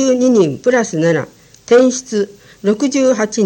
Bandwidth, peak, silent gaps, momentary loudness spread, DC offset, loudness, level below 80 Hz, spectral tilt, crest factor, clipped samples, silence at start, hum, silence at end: 17 kHz; 0 dBFS; none; 9 LU; under 0.1%; -14 LUFS; -58 dBFS; -5 dB/octave; 14 dB; under 0.1%; 0 s; none; 0 s